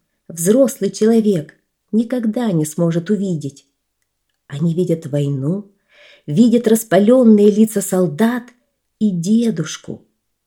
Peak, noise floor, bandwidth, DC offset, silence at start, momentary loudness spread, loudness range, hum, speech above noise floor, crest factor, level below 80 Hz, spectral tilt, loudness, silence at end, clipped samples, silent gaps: 0 dBFS; -72 dBFS; 17.5 kHz; under 0.1%; 0.3 s; 15 LU; 7 LU; none; 57 dB; 16 dB; -66 dBFS; -6.5 dB/octave; -16 LUFS; 0.5 s; under 0.1%; none